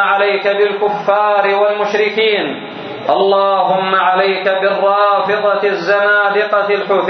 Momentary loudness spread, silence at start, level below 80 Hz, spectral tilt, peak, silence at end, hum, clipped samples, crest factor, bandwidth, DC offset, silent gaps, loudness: 4 LU; 0 s; -68 dBFS; -5 dB/octave; 0 dBFS; 0 s; none; under 0.1%; 14 dB; 6.4 kHz; under 0.1%; none; -13 LUFS